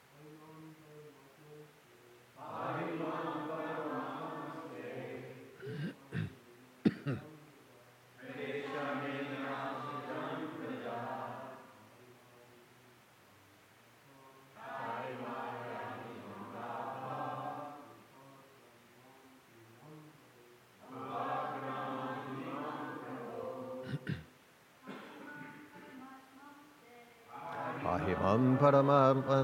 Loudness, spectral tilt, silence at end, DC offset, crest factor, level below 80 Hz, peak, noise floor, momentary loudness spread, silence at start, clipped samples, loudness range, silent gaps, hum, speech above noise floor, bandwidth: -38 LUFS; -7.5 dB/octave; 0 s; under 0.1%; 26 dB; -76 dBFS; -14 dBFS; -63 dBFS; 23 LU; 0.1 s; under 0.1%; 10 LU; none; none; 35 dB; 16.5 kHz